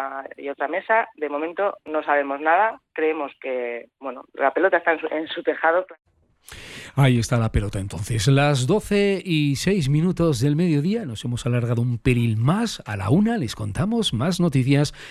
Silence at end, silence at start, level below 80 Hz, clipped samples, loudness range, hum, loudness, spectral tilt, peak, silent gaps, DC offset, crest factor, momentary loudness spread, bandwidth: 0 s; 0 s; -42 dBFS; under 0.1%; 3 LU; none; -22 LUFS; -6 dB/octave; -6 dBFS; none; under 0.1%; 16 dB; 10 LU; 13 kHz